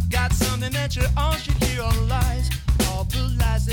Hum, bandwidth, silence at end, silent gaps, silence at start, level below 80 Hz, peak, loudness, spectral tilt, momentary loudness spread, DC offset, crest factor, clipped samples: none; 18.5 kHz; 0 s; none; 0 s; -24 dBFS; -8 dBFS; -23 LUFS; -4.5 dB/octave; 3 LU; under 0.1%; 12 dB; under 0.1%